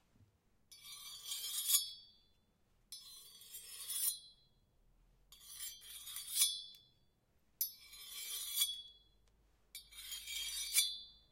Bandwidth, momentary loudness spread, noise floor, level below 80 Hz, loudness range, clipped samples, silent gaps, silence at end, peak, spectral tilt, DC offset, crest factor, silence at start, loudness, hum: 16 kHz; 21 LU; -75 dBFS; -74 dBFS; 5 LU; under 0.1%; none; 0.15 s; -16 dBFS; 3.5 dB/octave; under 0.1%; 28 dB; 0.2 s; -38 LUFS; none